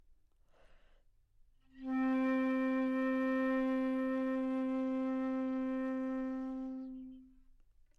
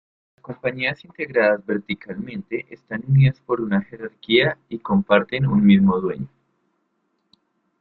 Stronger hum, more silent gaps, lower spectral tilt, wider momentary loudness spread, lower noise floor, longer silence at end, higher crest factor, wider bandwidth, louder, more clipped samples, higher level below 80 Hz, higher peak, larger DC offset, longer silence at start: neither; neither; second, -6.5 dB/octave vs -10 dB/octave; second, 10 LU vs 15 LU; second, -67 dBFS vs -71 dBFS; second, 0.7 s vs 1.55 s; second, 12 dB vs 20 dB; about the same, 5 kHz vs 4.6 kHz; second, -36 LUFS vs -20 LUFS; neither; second, -66 dBFS vs -54 dBFS; second, -26 dBFS vs 0 dBFS; neither; first, 1.75 s vs 0.5 s